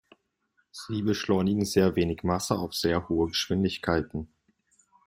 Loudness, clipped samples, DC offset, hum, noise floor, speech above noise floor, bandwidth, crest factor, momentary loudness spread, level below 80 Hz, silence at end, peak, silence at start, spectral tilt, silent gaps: -27 LUFS; under 0.1%; under 0.1%; none; -73 dBFS; 46 dB; 16 kHz; 20 dB; 13 LU; -54 dBFS; 0.8 s; -8 dBFS; 0.75 s; -5.5 dB/octave; none